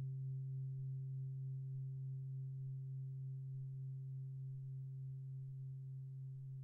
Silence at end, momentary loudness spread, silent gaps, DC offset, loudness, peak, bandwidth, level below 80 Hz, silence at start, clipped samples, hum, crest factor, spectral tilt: 0 s; 4 LU; none; under 0.1%; -48 LUFS; -40 dBFS; 0.5 kHz; -80 dBFS; 0 s; under 0.1%; none; 6 dB; -18 dB/octave